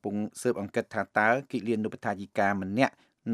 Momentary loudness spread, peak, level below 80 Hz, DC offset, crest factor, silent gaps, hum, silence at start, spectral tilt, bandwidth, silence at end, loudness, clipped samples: 7 LU; -8 dBFS; -76 dBFS; under 0.1%; 22 dB; none; none; 0.05 s; -6 dB/octave; 14 kHz; 0 s; -29 LUFS; under 0.1%